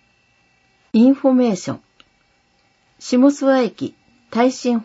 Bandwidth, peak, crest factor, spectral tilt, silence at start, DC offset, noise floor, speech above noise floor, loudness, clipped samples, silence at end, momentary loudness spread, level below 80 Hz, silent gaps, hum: 8 kHz; -2 dBFS; 16 dB; -5.5 dB/octave; 0.95 s; under 0.1%; -61 dBFS; 45 dB; -17 LUFS; under 0.1%; 0 s; 16 LU; -66 dBFS; none; none